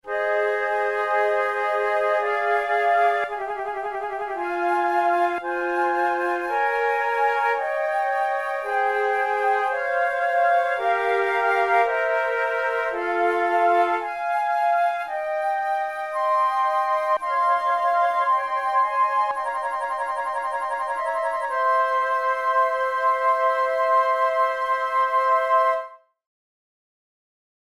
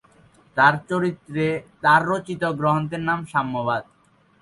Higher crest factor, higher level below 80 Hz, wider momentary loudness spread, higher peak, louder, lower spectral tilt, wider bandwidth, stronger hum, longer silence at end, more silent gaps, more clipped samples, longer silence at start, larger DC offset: about the same, 16 dB vs 20 dB; second, -64 dBFS vs -58 dBFS; about the same, 6 LU vs 8 LU; second, -8 dBFS vs -4 dBFS; about the same, -22 LUFS vs -22 LUFS; second, -3 dB/octave vs -6.5 dB/octave; first, 14 kHz vs 11.5 kHz; neither; first, 1.75 s vs 0.6 s; neither; neither; second, 0.05 s vs 0.55 s; neither